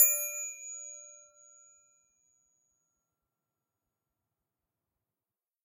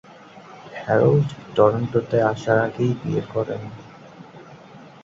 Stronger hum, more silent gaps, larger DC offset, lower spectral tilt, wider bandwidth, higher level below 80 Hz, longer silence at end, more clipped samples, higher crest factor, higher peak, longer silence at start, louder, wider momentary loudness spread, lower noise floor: neither; neither; neither; second, 3.5 dB/octave vs -8 dB/octave; first, 16 kHz vs 7.6 kHz; second, under -90 dBFS vs -56 dBFS; first, 4.5 s vs 0.15 s; neither; first, 30 dB vs 20 dB; second, -8 dBFS vs -2 dBFS; second, 0 s vs 0.35 s; second, -31 LUFS vs -21 LUFS; about the same, 23 LU vs 21 LU; first, under -90 dBFS vs -44 dBFS